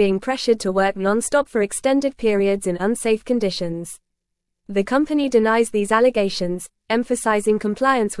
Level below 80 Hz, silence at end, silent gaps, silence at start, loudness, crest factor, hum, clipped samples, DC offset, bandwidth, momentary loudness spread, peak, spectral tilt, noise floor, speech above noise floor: -50 dBFS; 0 s; none; 0 s; -20 LUFS; 16 dB; none; under 0.1%; 0.1%; 12 kHz; 9 LU; -4 dBFS; -4.5 dB/octave; -78 dBFS; 59 dB